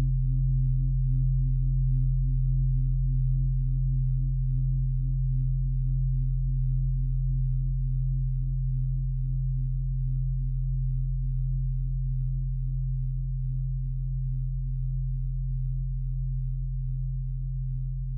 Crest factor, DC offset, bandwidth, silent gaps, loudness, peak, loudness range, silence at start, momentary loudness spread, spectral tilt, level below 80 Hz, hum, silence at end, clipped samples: 10 dB; under 0.1%; 0.3 kHz; none; -29 LUFS; -16 dBFS; 5 LU; 0 s; 5 LU; -14.5 dB/octave; -28 dBFS; none; 0 s; under 0.1%